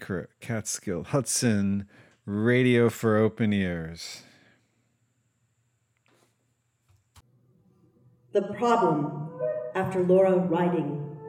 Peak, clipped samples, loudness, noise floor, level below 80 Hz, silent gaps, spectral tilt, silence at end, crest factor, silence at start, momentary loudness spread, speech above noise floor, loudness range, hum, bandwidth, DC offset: -10 dBFS; under 0.1%; -26 LUFS; -73 dBFS; -62 dBFS; none; -5.5 dB/octave; 0 s; 18 dB; 0 s; 13 LU; 48 dB; 13 LU; none; 17 kHz; under 0.1%